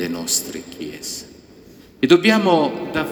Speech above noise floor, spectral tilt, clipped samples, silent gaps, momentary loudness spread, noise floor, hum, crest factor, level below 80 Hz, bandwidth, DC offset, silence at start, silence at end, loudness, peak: 27 dB; -3.5 dB/octave; under 0.1%; none; 18 LU; -45 dBFS; none; 20 dB; -54 dBFS; over 20 kHz; under 0.1%; 0 s; 0 s; -18 LUFS; 0 dBFS